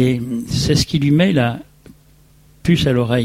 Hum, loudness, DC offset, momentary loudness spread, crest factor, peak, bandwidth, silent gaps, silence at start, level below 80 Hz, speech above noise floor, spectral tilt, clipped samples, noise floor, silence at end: none; -17 LUFS; under 0.1%; 8 LU; 14 dB; -2 dBFS; 16 kHz; none; 0 s; -38 dBFS; 34 dB; -6 dB/octave; under 0.1%; -49 dBFS; 0 s